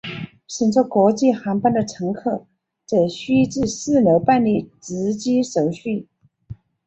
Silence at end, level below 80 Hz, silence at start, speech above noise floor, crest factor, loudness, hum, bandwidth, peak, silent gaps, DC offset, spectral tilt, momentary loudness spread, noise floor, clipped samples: 0.35 s; -54 dBFS; 0.05 s; 22 dB; 16 dB; -19 LUFS; none; 8.2 kHz; -4 dBFS; none; under 0.1%; -6 dB/octave; 12 LU; -40 dBFS; under 0.1%